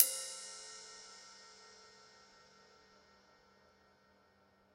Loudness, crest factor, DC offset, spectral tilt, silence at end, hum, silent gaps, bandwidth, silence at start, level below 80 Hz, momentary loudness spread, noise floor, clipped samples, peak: -40 LUFS; 36 dB; under 0.1%; 1.5 dB/octave; 2.85 s; none; none; 16 kHz; 0 s; -86 dBFS; 21 LU; -70 dBFS; under 0.1%; -8 dBFS